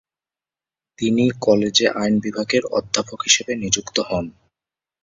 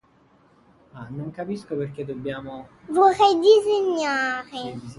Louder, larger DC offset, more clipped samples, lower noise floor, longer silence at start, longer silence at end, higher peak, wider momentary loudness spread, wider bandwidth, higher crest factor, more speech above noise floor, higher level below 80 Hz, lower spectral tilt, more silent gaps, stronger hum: about the same, -19 LUFS vs -21 LUFS; neither; neither; first, under -90 dBFS vs -58 dBFS; about the same, 1 s vs 0.95 s; first, 0.7 s vs 0.05 s; first, 0 dBFS vs -4 dBFS; second, 8 LU vs 19 LU; second, 7.8 kHz vs 11.5 kHz; about the same, 20 dB vs 18 dB; first, over 70 dB vs 36 dB; first, -52 dBFS vs -62 dBFS; second, -3 dB/octave vs -5 dB/octave; neither; neither